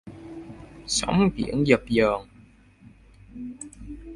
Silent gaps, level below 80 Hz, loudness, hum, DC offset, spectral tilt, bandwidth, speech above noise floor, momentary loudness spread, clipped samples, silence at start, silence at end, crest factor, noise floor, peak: none; -46 dBFS; -23 LUFS; none; under 0.1%; -5 dB/octave; 11.5 kHz; 31 dB; 21 LU; under 0.1%; 0.05 s; 0 s; 24 dB; -53 dBFS; -4 dBFS